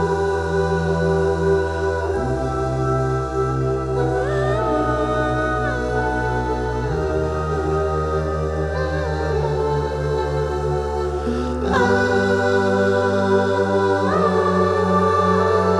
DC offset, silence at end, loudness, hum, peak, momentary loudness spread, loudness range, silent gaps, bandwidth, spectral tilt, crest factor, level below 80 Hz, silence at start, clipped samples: under 0.1%; 0 s; -20 LUFS; none; -4 dBFS; 5 LU; 4 LU; none; 11 kHz; -7 dB/octave; 16 dB; -32 dBFS; 0 s; under 0.1%